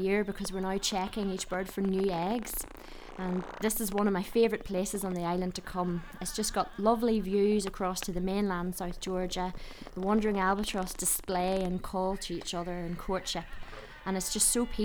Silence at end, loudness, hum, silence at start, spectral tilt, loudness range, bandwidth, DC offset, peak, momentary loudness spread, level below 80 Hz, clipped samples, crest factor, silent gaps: 0 s; -31 LUFS; none; 0 s; -4 dB/octave; 2 LU; over 20 kHz; under 0.1%; -12 dBFS; 9 LU; -46 dBFS; under 0.1%; 18 dB; none